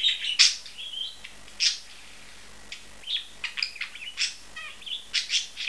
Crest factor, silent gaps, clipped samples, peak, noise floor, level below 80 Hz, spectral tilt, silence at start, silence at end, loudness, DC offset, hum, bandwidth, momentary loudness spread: 28 dB; none; under 0.1%; -2 dBFS; -49 dBFS; -62 dBFS; 3 dB/octave; 0 s; 0 s; -26 LUFS; 0.5%; none; 11 kHz; 25 LU